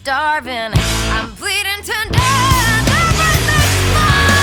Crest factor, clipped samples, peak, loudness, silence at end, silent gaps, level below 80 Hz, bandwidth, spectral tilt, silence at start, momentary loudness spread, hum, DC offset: 14 dB; under 0.1%; 0 dBFS; -14 LUFS; 0 s; none; -24 dBFS; 19 kHz; -3.5 dB/octave; 0.05 s; 6 LU; none; under 0.1%